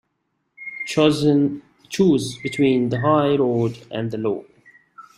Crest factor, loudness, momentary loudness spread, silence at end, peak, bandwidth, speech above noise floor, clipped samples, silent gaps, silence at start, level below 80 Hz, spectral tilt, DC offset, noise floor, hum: 18 dB; -20 LUFS; 13 LU; 0.15 s; -2 dBFS; 12.5 kHz; 54 dB; under 0.1%; none; 0.6 s; -58 dBFS; -6.5 dB/octave; under 0.1%; -73 dBFS; none